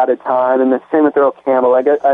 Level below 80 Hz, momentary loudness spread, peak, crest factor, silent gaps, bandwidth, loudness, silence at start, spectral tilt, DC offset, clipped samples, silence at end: -66 dBFS; 3 LU; -2 dBFS; 10 dB; none; 3.8 kHz; -13 LUFS; 0 s; -8.5 dB/octave; under 0.1%; under 0.1%; 0 s